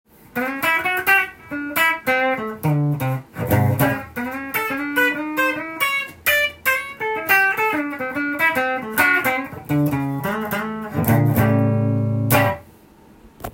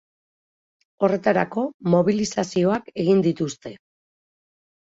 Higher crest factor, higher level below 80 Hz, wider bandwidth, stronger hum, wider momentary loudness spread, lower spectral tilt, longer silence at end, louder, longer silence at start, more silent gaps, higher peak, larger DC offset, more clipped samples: about the same, 18 dB vs 18 dB; first, -52 dBFS vs -62 dBFS; first, 17 kHz vs 8 kHz; neither; about the same, 9 LU vs 9 LU; about the same, -5.5 dB/octave vs -6.5 dB/octave; second, 0.05 s vs 1.1 s; first, -19 LUFS vs -22 LUFS; second, 0.35 s vs 1 s; second, none vs 1.74-1.80 s; first, -2 dBFS vs -6 dBFS; neither; neither